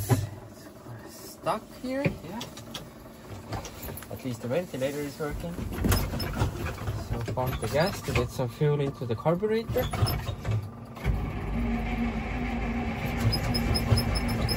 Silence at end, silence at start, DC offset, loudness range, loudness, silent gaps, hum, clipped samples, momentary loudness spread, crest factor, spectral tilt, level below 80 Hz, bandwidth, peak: 0 s; 0 s; under 0.1%; 7 LU; -30 LUFS; none; none; under 0.1%; 14 LU; 22 dB; -6 dB/octave; -38 dBFS; 16 kHz; -8 dBFS